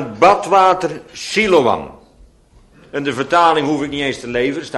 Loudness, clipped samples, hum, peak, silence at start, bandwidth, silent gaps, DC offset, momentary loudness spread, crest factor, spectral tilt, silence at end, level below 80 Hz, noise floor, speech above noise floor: -15 LUFS; under 0.1%; none; 0 dBFS; 0 s; 11.5 kHz; none; under 0.1%; 11 LU; 16 dB; -4.5 dB/octave; 0 s; -48 dBFS; -49 dBFS; 34 dB